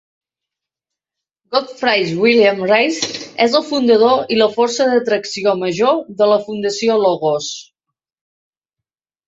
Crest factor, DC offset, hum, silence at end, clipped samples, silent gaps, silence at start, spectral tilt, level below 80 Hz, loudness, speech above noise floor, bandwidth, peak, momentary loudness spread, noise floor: 16 dB; under 0.1%; none; 1.65 s; under 0.1%; none; 1.5 s; -4 dB/octave; -62 dBFS; -15 LUFS; 70 dB; 8 kHz; 0 dBFS; 8 LU; -84 dBFS